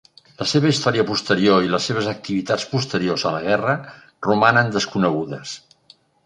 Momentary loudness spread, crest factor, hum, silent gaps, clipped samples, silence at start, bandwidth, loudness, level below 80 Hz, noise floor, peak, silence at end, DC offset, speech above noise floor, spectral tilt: 10 LU; 20 dB; none; none; under 0.1%; 0.4 s; 11 kHz; -20 LUFS; -56 dBFS; -54 dBFS; -2 dBFS; 0.65 s; under 0.1%; 34 dB; -5 dB/octave